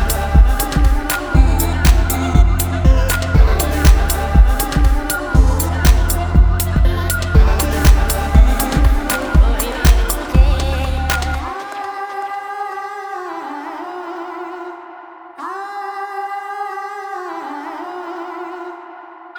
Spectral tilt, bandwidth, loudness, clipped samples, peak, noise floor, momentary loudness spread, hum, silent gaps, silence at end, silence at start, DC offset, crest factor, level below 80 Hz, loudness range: -5 dB/octave; over 20 kHz; -17 LUFS; under 0.1%; 0 dBFS; -36 dBFS; 14 LU; none; none; 0 s; 0 s; under 0.1%; 14 dB; -16 dBFS; 12 LU